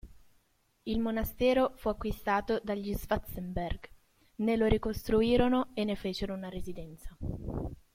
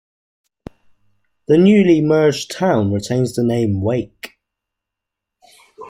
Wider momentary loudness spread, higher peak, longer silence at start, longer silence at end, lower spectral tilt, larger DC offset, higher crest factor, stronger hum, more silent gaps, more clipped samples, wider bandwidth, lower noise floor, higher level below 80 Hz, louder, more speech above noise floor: second, 15 LU vs 19 LU; second, -10 dBFS vs -2 dBFS; second, 0.05 s vs 1.5 s; first, 0.2 s vs 0 s; about the same, -6.5 dB/octave vs -7 dB/octave; neither; first, 22 dB vs 16 dB; neither; neither; neither; about the same, 16.5 kHz vs 15.5 kHz; second, -71 dBFS vs -82 dBFS; first, -44 dBFS vs -52 dBFS; second, -32 LUFS vs -16 LUFS; second, 40 dB vs 67 dB